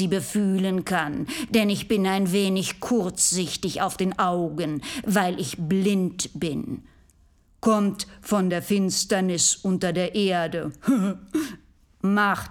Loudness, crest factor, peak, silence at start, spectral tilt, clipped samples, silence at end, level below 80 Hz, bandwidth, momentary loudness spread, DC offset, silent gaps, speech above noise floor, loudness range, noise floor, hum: -24 LUFS; 18 dB; -6 dBFS; 0 s; -4 dB/octave; under 0.1%; 0 s; -56 dBFS; 17.5 kHz; 8 LU; under 0.1%; none; 35 dB; 3 LU; -58 dBFS; none